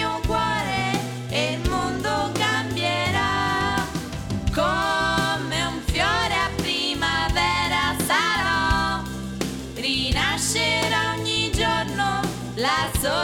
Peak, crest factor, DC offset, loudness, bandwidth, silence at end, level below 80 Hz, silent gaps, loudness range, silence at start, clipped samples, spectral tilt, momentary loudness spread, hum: -8 dBFS; 16 dB; under 0.1%; -22 LUFS; 17.5 kHz; 0 s; -36 dBFS; none; 2 LU; 0 s; under 0.1%; -3.5 dB/octave; 6 LU; none